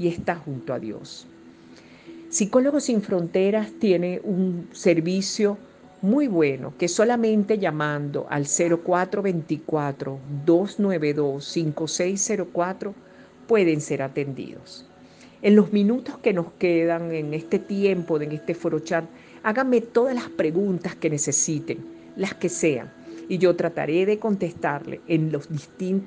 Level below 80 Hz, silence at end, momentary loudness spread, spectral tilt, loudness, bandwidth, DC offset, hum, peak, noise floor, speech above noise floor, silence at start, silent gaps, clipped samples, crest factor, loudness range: -66 dBFS; 0 s; 11 LU; -5 dB/octave; -23 LUFS; 10 kHz; under 0.1%; none; -4 dBFS; -49 dBFS; 26 dB; 0 s; none; under 0.1%; 20 dB; 3 LU